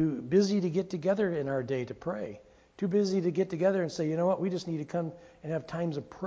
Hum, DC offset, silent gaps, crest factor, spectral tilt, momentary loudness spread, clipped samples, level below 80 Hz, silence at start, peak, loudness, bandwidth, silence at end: none; under 0.1%; none; 18 dB; -7 dB/octave; 10 LU; under 0.1%; -66 dBFS; 0 s; -14 dBFS; -31 LUFS; 8 kHz; 0 s